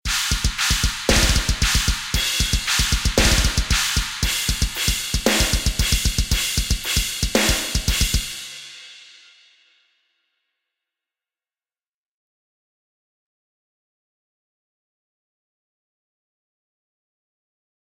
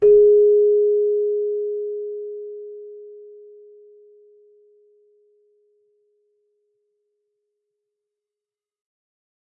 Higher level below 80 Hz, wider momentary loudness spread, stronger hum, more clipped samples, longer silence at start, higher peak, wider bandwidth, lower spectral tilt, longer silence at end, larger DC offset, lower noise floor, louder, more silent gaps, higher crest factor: first, -28 dBFS vs -60 dBFS; second, 5 LU vs 26 LU; neither; neither; about the same, 0.05 s vs 0 s; first, -2 dBFS vs -6 dBFS; first, 17 kHz vs 1.4 kHz; second, -2.5 dB/octave vs -10 dB/octave; first, 8.75 s vs 6.35 s; neither; about the same, under -90 dBFS vs under -90 dBFS; about the same, -19 LUFS vs -18 LUFS; neither; about the same, 20 dB vs 16 dB